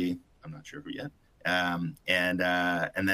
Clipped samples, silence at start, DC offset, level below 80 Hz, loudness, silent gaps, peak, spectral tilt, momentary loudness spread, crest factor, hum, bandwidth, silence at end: under 0.1%; 0 s; under 0.1%; -64 dBFS; -29 LUFS; none; -12 dBFS; -5 dB/octave; 17 LU; 20 dB; none; 15.5 kHz; 0 s